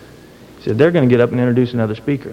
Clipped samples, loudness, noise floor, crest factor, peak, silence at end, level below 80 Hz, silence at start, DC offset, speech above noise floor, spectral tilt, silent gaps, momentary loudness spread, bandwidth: under 0.1%; -15 LUFS; -40 dBFS; 16 dB; 0 dBFS; 0 s; -50 dBFS; 0 s; under 0.1%; 26 dB; -9 dB/octave; none; 9 LU; 9.6 kHz